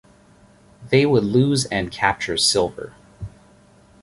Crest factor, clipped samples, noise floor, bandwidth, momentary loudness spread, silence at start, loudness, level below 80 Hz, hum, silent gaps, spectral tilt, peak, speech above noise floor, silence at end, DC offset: 20 dB; under 0.1%; -52 dBFS; 11.5 kHz; 21 LU; 0.8 s; -19 LUFS; -48 dBFS; none; none; -4.5 dB/octave; -2 dBFS; 33 dB; 0.75 s; under 0.1%